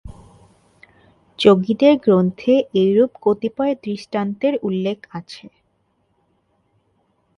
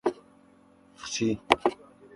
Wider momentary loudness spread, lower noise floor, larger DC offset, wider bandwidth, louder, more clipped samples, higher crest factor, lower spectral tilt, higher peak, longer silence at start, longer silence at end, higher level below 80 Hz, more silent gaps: second, 15 LU vs 23 LU; first, -66 dBFS vs -58 dBFS; neither; about the same, 10.5 kHz vs 11.5 kHz; first, -18 LUFS vs -28 LUFS; neither; second, 20 dB vs 30 dB; first, -7.5 dB/octave vs -3.5 dB/octave; about the same, 0 dBFS vs 0 dBFS; about the same, 0.05 s vs 0.05 s; first, 2 s vs 0.4 s; first, -54 dBFS vs -60 dBFS; neither